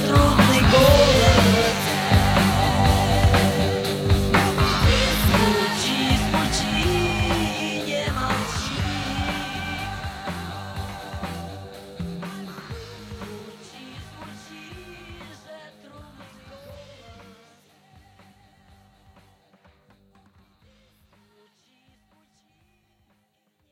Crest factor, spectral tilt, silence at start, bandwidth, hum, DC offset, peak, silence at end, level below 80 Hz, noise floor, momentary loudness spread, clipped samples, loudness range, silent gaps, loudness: 20 dB; -5 dB/octave; 0 s; 17 kHz; none; under 0.1%; -2 dBFS; 6.6 s; -32 dBFS; -69 dBFS; 25 LU; under 0.1%; 24 LU; none; -20 LUFS